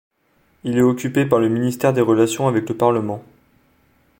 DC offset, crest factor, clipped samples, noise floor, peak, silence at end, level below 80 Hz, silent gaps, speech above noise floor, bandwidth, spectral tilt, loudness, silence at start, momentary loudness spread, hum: under 0.1%; 18 dB; under 0.1%; -61 dBFS; -2 dBFS; 1 s; -58 dBFS; none; 44 dB; 17 kHz; -6.5 dB/octave; -18 LUFS; 0.65 s; 8 LU; none